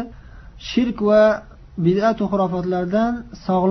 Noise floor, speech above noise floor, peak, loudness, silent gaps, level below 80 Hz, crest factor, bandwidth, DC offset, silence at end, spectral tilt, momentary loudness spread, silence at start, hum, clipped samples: -40 dBFS; 22 dB; -4 dBFS; -19 LUFS; none; -44 dBFS; 14 dB; 6.4 kHz; under 0.1%; 0 s; -7.5 dB/octave; 13 LU; 0 s; none; under 0.1%